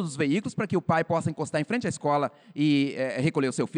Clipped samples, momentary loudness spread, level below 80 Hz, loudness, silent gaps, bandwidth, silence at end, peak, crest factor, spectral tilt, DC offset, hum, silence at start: under 0.1%; 4 LU; -70 dBFS; -27 LUFS; none; 10.5 kHz; 0 s; -12 dBFS; 14 dB; -6 dB/octave; under 0.1%; none; 0 s